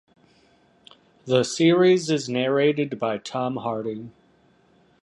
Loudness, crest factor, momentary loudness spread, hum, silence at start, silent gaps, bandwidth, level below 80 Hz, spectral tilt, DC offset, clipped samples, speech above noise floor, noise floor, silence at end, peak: -22 LUFS; 18 dB; 15 LU; none; 1.25 s; none; 11.5 kHz; -68 dBFS; -5.5 dB/octave; under 0.1%; under 0.1%; 38 dB; -60 dBFS; 0.95 s; -6 dBFS